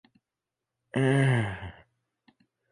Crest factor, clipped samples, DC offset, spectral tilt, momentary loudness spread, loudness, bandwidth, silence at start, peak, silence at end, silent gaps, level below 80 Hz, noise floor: 18 dB; under 0.1%; under 0.1%; -7 dB/octave; 18 LU; -26 LUFS; 11 kHz; 0.95 s; -12 dBFS; 1 s; none; -58 dBFS; -88 dBFS